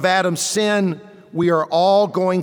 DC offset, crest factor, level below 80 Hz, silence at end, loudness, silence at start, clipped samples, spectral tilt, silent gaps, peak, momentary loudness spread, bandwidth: under 0.1%; 12 dB; -66 dBFS; 0 s; -18 LUFS; 0 s; under 0.1%; -4.5 dB/octave; none; -6 dBFS; 8 LU; over 20 kHz